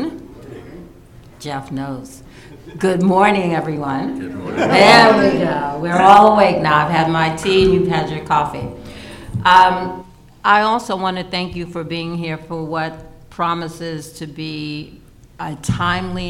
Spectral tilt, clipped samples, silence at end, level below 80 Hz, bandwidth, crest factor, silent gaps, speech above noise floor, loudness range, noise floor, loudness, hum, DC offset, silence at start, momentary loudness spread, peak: -5.5 dB/octave; under 0.1%; 0 s; -42 dBFS; 16.5 kHz; 16 dB; none; 26 dB; 13 LU; -42 dBFS; -15 LUFS; none; under 0.1%; 0 s; 21 LU; 0 dBFS